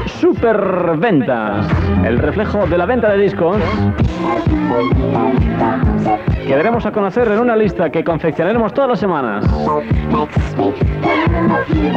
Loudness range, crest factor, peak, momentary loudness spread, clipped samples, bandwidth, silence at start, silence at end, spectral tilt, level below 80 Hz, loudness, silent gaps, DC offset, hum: 1 LU; 10 dB; -4 dBFS; 3 LU; under 0.1%; 7.8 kHz; 0 s; 0 s; -8.5 dB/octave; -26 dBFS; -15 LUFS; none; under 0.1%; none